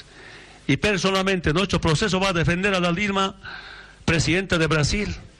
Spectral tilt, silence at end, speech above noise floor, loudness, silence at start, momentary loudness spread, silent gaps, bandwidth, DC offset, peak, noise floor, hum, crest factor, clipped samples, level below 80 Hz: -4.5 dB/octave; 0.1 s; 22 dB; -21 LUFS; 0.15 s; 11 LU; none; 12 kHz; under 0.1%; -8 dBFS; -44 dBFS; none; 14 dB; under 0.1%; -38 dBFS